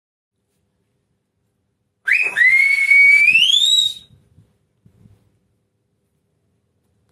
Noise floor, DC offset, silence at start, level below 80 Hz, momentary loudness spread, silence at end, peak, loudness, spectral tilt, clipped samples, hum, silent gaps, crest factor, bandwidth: -70 dBFS; under 0.1%; 2.05 s; -68 dBFS; 11 LU; 3.2 s; -4 dBFS; -11 LUFS; 2.5 dB/octave; under 0.1%; none; none; 16 dB; 15.5 kHz